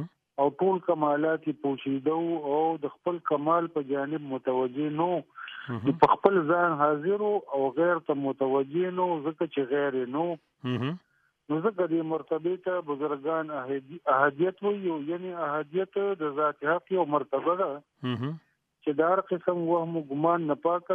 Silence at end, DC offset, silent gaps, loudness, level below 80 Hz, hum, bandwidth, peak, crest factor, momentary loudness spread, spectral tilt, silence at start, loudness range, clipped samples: 0 s; under 0.1%; none; -28 LUFS; -72 dBFS; none; 5.4 kHz; -4 dBFS; 24 dB; 9 LU; -9.5 dB/octave; 0 s; 4 LU; under 0.1%